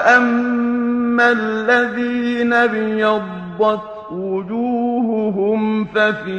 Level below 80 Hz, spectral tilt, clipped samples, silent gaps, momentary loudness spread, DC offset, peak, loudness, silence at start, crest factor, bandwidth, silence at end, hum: -56 dBFS; -6 dB/octave; under 0.1%; none; 8 LU; under 0.1%; 0 dBFS; -17 LUFS; 0 s; 16 dB; 8.4 kHz; 0 s; none